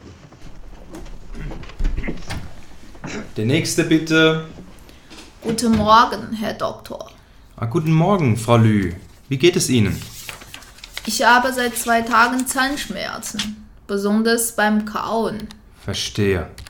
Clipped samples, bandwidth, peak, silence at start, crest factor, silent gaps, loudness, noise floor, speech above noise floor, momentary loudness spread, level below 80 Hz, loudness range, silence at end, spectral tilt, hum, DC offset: under 0.1%; 18 kHz; 0 dBFS; 0.05 s; 20 dB; none; -18 LUFS; -41 dBFS; 23 dB; 21 LU; -36 dBFS; 4 LU; 0 s; -4.5 dB/octave; none; under 0.1%